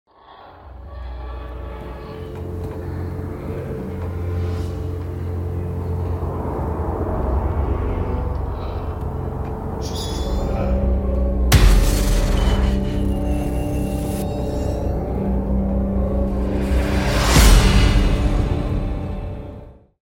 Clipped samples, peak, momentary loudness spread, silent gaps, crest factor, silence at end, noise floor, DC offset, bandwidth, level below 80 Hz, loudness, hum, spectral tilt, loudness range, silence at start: under 0.1%; -2 dBFS; 16 LU; none; 18 dB; 0.35 s; -44 dBFS; under 0.1%; 17 kHz; -22 dBFS; -22 LUFS; none; -5.5 dB/octave; 10 LU; 0.3 s